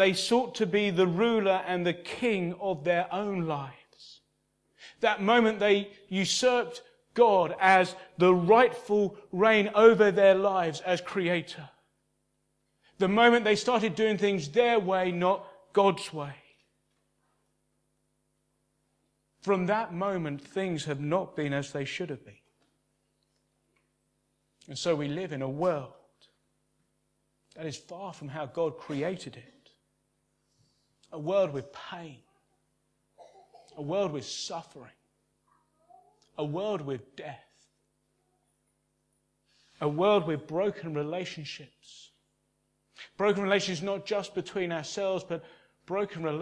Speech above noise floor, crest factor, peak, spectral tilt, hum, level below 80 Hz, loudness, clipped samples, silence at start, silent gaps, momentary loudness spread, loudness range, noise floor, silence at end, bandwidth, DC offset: 48 dB; 24 dB; -6 dBFS; -5 dB/octave; none; -72 dBFS; -27 LUFS; under 0.1%; 0 s; none; 18 LU; 14 LU; -76 dBFS; 0 s; 11 kHz; under 0.1%